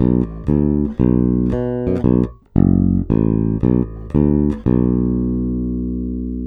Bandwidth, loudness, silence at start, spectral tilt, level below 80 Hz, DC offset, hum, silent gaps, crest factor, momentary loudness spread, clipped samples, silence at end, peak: 3.7 kHz; -17 LUFS; 0 s; -12.5 dB/octave; -28 dBFS; under 0.1%; 60 Hz at -40 dBFS; none; 16 dB; 6 LU; under 0.1%; 0 s; 0 dBFS